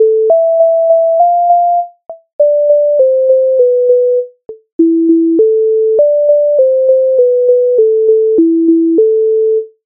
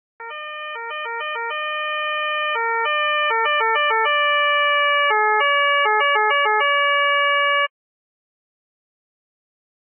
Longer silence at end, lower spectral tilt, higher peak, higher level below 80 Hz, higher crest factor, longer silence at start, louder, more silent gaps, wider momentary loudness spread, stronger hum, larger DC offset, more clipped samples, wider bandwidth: second, 0.2 s vs 2.3 s; first, -12 dB/octave vs 9 dB/octave; first, 0 dBFS vs -6 dBFS; first, -68 dBFS vs under -90 dBFS; second, 8 dB vs 14 dB; second, 0 s vs 0.2 s; first, -10 LUFS vs -18 LUFS; first, 2.33-2.39 s, 4.72-4.79 s vs none; second, 5 LU vs 11 LU; neither; neither; neither; second, 1.1 kHz vs 3.3 kHz